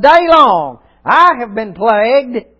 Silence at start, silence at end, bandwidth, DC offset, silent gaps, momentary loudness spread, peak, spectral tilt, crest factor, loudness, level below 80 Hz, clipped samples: 0 s; 0.2 s; 8 kHz; under 0.1%; none; 14 LU; 0 dBFS; -5.5 dB/octave; 10 dB; -10 LUFS; -46 dBFS; 0.7%